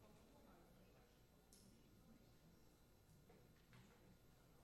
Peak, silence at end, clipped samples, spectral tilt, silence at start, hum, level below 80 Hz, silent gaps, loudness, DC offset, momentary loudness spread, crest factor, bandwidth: -50 dBFS; 0 s; under 0.1%; -5 dB/octave; 0 s; 60 Hz at -80 dBFS; -78 dBFS; none; -70 LUFS; under 0.1%; 1 LU; 20 dB; 12.5 kHz